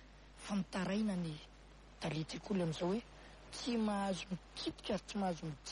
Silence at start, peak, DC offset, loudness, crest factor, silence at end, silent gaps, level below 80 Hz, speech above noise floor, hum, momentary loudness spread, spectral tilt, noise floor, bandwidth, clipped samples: 0 s; -26 dBFS; under 0.1%; -40 LUFS; 14 dB; 0 s; none; -60 dBFS; 19 dB; 50 Hz at -60 dBFS; 18 LU; -5.5 dB/octave; -59 dBFS; 11.5 kHz; under 0.1%